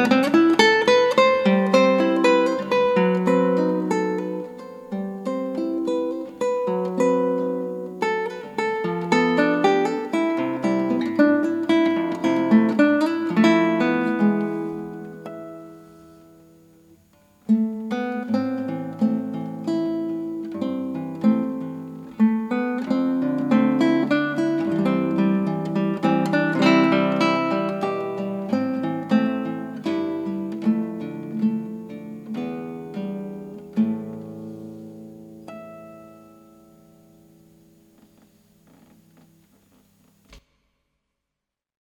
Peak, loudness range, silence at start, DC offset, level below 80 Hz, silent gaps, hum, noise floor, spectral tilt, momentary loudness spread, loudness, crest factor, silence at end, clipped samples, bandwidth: -2 dBFS; 11 LU; 0 s; under 0.1%; -66 dBFS; none; none; -85 dBFS; -6.5 dB/octave; 18 LU; -22 LUFS; 20 dB; 1.55 s; under 0.1%; 13 kHz